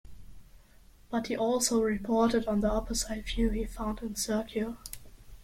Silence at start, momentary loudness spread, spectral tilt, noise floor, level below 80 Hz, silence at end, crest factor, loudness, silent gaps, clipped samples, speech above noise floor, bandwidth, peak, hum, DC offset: 0.05 s; 9 LU; -4 dB/octave; -57 dBFS; -42 dBFS; 0 s; 18 dB; -30 LUFS; none; under 0.1%; 27 dB; 16.5 kHz; -14 dBFS; none; under 0.1%